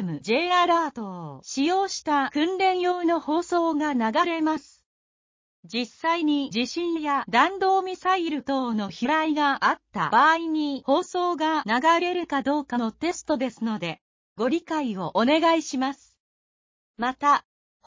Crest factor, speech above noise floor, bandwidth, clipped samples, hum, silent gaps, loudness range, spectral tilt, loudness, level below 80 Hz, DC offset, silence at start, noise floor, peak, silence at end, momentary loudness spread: 18 dB; over 66 dB; 7.6 kHz; under 0.1%; none; 4.86-5.63 s, 14.01-14.36 s, 16.20-16.94 s; 4 LU; -4 dB/octave; -24 LUFS; -66 dBFS; under 0.1%; 0 s; under -90 dBFS; -6 dBFS; 0.45 s; 9 LU